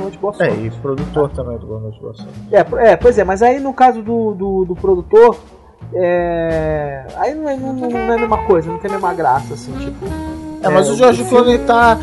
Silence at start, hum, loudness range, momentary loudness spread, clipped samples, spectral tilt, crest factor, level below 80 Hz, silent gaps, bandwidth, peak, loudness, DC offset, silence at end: 0 s; none; 5 LU; 15 LU; under 0.1%; -6 dB/octave; 14 dB; -34 dBFS; none; 11.5 kHz; 0 dBFS; -14 LUFS; under 0.1%; 0 s